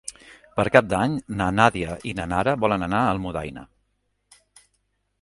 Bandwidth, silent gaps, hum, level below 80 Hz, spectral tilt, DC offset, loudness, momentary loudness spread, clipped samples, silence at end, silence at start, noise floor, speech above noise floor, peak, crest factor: 11.5 kHz; none; 50 Hz at -50 dBFS; -46 dBFS; -6 dB/octave; under 0.1%; -22 LUFS; 13 LU; under 0.1%; 1.55 s; 0.05 s; -72 dBFS; 50 dB; 0 dBFS; 24 dB